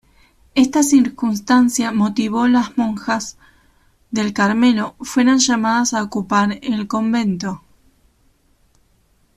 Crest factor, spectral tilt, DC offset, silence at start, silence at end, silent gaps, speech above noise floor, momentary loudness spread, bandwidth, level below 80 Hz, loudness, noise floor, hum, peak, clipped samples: 16 dB; -4 dB/octave; under 0.1%; 0.55 s; 1.8 s; none; 42 dB; 9 LU; 14 kHz; -54 dBFS; -17 LUFS; -58 dBFS; none; -2 dBFS; under 0.1%